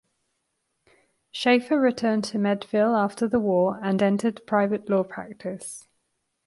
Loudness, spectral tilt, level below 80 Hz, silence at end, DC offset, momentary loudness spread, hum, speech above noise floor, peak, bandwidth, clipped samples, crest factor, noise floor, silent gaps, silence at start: -24 LUFS; -6 dB/octave; -66 dBFS; 0.65 s; under 0.1%; 13 LU; none; 53 dB; -8 dBFS; 11.5 kHz; under 0.1%; 18 dB; -76 dBFS; none; 1.35 s